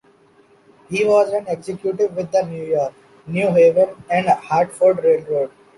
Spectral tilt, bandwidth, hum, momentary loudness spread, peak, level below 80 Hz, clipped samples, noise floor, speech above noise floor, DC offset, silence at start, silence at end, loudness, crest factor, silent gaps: -6.5 dB/octave; 11.5 kHz; none; 10 LU; -4 dBFS; -62 dBFS; under 0.1%; -53 dBFS; 36 dB; under 0.1%; 0.9 s; 0.3 s; -18 LUFS; 14 dB; none